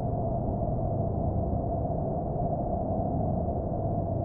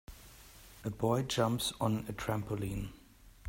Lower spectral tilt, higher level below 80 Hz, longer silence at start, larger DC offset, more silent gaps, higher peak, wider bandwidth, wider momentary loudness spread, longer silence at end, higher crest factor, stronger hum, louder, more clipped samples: first, -11.5 dB/octave vs -5.5 dB/octave; first, -38 dBFS vs -54 dBFS; about the same, 0 s vs 0.1 s; neither; neither; about the same, -16 dBFS vs -16 dBFS; second, 1.9 kHz vs 16 kHz; second, 1 LU vs 22 LU; about the same, 0 s vs 0 s; second, 12 dB vs 20 dB; neither; first, -30 LUFS vs -35 LUFS; neither